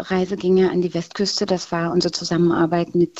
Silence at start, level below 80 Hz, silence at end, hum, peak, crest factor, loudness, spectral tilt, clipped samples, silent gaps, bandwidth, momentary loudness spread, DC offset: 0 s; -54 dBFS; 0 s; none; -6 dBFS; 14 dB; -20 LUFS; -5.5 dB/octave; under 0.1%; none; 8.2 kHz; 5 LU; under 0.1%